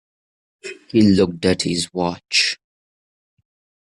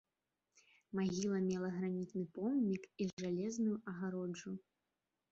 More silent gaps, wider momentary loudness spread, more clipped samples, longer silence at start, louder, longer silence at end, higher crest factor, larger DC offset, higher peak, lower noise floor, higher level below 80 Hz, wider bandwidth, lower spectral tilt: second, none vs 3.13-3.17 s; first, 19 LU vs 8 LU; neither; second, 0.65 s vs 0.95 s; first, -18 LUFS vs -40 LUFS; first, 1.35 s vs 0.7 s; about the same, 18 dB vs 14 dB; neither; first, -4 dBFS vs -26 dBFS; about the same, under -90 dBFS vs under -90 dBFS; first, -54 dBFS vs -78 dBFS; first, 12 kHz vs 7.8 kHz; second, -4.5 dB/octave vs -7.5 dB/octave